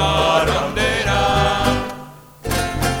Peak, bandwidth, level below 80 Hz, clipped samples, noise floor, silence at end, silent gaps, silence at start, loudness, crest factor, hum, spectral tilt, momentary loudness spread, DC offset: -2 dBFS; over 20 kHz; -30 dBFS; under 0.1%; -38 dBFS; 0 s; none; 0 s; -18 LUFS; 16 dB; none; -4 dB/octave; 11 LU; under 0.1%